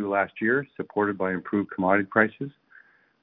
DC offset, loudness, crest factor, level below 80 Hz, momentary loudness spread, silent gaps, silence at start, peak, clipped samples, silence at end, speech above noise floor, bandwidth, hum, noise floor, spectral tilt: under 0.1%; -25 LUFS; 24 dB; -68 dBFS; 8 LU; none; 0 s; -4 dBFS; under 0.1%; 0.7 s; 31 dB; 4 kHz; none; -56 dBFS; -10.5 dB/octave